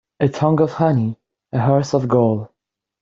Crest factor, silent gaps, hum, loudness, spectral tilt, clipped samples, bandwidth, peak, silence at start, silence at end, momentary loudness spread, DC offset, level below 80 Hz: 16 dB; none; none; -18 LUFS; -8 dB/octave; under 0.1%; 7.6 kHz; -2 dBFS; 0.2 s; 0.55 s; 9 LU; under 0.1%; -54 dBFS